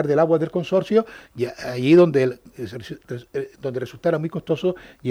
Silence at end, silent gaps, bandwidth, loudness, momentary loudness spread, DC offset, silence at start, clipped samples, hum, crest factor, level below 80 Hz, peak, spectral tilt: 0 s; none; 13.5 kHz; -21 LUFS; 19 LU; under 0.1%; 0 s; under 0.1%; none; 16 dB; -58 dBFS; -6 dBFS; -7.5 dB/octave